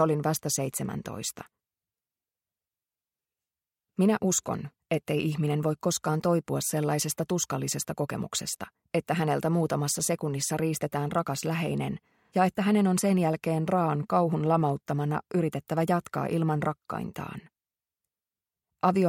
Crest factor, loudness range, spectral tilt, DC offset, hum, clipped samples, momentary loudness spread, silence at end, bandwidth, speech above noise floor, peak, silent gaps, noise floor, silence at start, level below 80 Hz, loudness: 18 dB; 6 LU; -5 dB/octave; under 0.1%; none; under 0.1%; 10 LU; 0 s; 16.5 kHz; over 62 dB; -10 dBFS; none; under -90 dBFS; 0 s; -64 dBFS; -28 LUFS